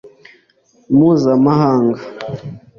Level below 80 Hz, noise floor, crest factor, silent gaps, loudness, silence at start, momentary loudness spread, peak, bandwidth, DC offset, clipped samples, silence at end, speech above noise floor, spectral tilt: -52 dBFS; -55 dBFS; 12 dB; none; -13 LUFS; 0.05 s; 15 LU; -2 dBFS; 6.8 kHz; under 0.1%; under 0.1%; 0.2 s; 42 dB; -9 dB/octave